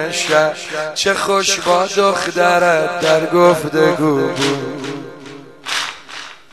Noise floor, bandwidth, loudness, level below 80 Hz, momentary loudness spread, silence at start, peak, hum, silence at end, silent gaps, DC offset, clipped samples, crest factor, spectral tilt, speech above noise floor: -36 dBFS; 13 kHz; -15 LUFS; -58 dBFS; 18 LU; 0 s; 0 dBFS; none; 0.15 s; none; 0.3%; under 0.1%; 16 dB; -3.5 dB/octave; 21 dB